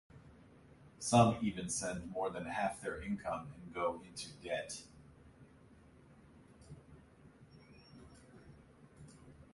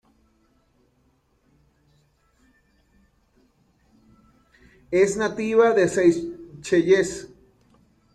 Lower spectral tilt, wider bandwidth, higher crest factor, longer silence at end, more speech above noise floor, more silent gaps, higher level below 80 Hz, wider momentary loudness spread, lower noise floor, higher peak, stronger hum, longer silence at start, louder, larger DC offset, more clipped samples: about the same, -5 dB/octave vs -5 dB/octave; about the same, 11.5 kHz vs 12 kHz; first, 26 dB vs 20 dB; second, 0.1 s vs 0.85 s; second, 25 dB vs 45 dB; neither; second, -64 dBFS vs -58 dBFS; first, 27 LU vs 14 LU; about the same, -62 dBFS vs -65 dBFS; second, -14 dBFS vs -6 dBFS; neither; second, 0.15 s vs 4.9 s; second, -37 LUFS vs -21 LUFS; neither; neither